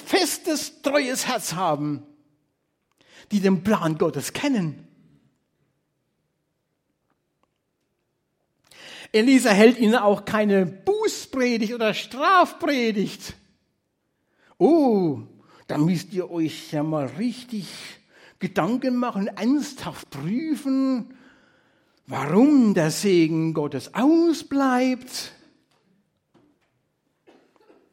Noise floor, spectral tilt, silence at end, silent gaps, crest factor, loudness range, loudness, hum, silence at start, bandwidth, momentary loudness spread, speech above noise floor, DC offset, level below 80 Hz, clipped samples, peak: -75 dBFS; -5 dB/octave; 2.65 s; none; 22 dB; 8 LU; -22 LUFS; none; 0 s; 16.5 kHz; 16 LU; 53 dB; under 0.1%; -66 dBFS; under 0.1%; -2 dBFS